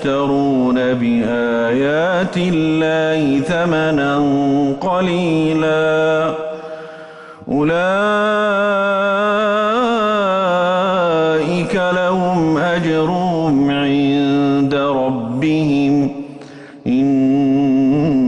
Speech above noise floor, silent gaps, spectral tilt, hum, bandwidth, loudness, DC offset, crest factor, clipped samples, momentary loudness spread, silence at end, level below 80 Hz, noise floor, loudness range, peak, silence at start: 20 dB; none; -7 dB/octave; none; 10 kHz; -16 LUFS; under 0.1%; 8 dB; under 0.1%; 5 LU; 0 s; -48 dBFS; -35 dBFS; 2 LU; -8 dBFS; 0 s